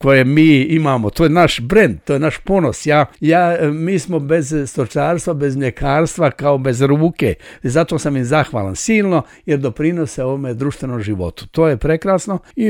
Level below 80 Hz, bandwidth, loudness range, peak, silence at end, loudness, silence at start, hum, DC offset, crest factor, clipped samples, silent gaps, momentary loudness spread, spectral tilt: -38 dBFS; 16 kHz; 4 LU; 0 dBFS; 0 s; -16 LUFS; 0 s; none; under 0.1%; 14 dB; under 0.1%; none; 8 LU; -6 dB/octave